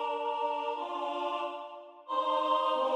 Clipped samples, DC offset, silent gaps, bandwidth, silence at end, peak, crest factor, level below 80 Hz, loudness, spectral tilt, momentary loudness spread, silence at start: under 0.1%; under 0.1%; none; 10 kHz; 0 s; -18 dBFS; 14 dB; under -90 dBFS; -32 LUFS; -1.5 dB/octave; 12 LU; 0 s